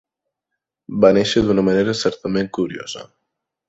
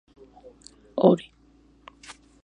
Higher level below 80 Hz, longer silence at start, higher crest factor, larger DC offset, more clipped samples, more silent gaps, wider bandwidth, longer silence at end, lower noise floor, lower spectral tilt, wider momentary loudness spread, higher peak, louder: first, -48 dBFS vs -62 dBFS; about the same, 0.9 s vs 0.95 s; second, 18 dB vs 26 dB; neither; neither; neither; second, 8 kHz vs 11 kHz; second, 0.65 s vs 1.2 s; first, -81 dBFS vs -58 dBFS; second, -5.5 dB/octave vs -7.5 dB/octave; second, 16 LU vs 26 LU; about the same, -2 dBFS vs -2 dBFS; first, -18 LUFS vs -23 LUFS